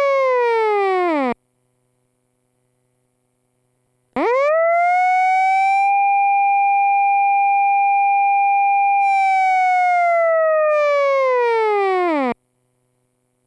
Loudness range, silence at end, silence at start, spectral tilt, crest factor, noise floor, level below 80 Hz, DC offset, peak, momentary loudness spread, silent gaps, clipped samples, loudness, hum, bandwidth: 8 LU; 1.15 s; 0 s; -3.5 dB/octave; 8 dB; -68 dBFS; -70 dBFS; under 0.1%; -10 dBFS; 4 LU; none; under 0.1%; -16 LUFS; 50 Hz at -80 dBFS; 10.5 kHz